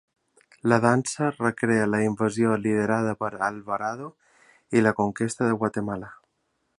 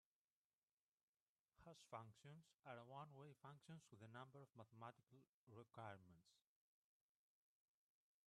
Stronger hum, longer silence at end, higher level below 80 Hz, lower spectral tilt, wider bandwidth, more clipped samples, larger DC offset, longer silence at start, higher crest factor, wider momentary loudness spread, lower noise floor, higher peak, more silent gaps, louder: neither; second, 0.65 s vs 1.85 s; first, -62 dBFS vs under -90 dBFS; about the same, -6 dB/octave vs -6 dB/octave; about the same, 11.5 kHz vs 10.5 kHz; neither; neither; second, 0.65 s vs 1.55 s; about the same, 22 dB vs 24 dB; first, 10 LU vs 7 LU; second, -74 dBFS vs under -90 dBFS; first, -4 dBFS vs -42 dBFS; second, none vs 5.27-5.47 s; first, -25 LUFS vs -63 LUFS